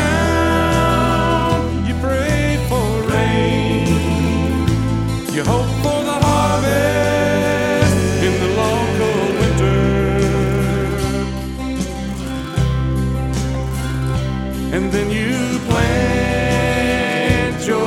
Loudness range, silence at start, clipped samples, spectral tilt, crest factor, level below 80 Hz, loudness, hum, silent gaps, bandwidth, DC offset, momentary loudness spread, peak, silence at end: 4 LU; 0 s; under 0.1%; -6 dB/octave; 16 dB; -26 dBFS; -17 LUFS; none; none; 16 kHz; under 0.1%; 6 LU; 0 dBFS; 0 s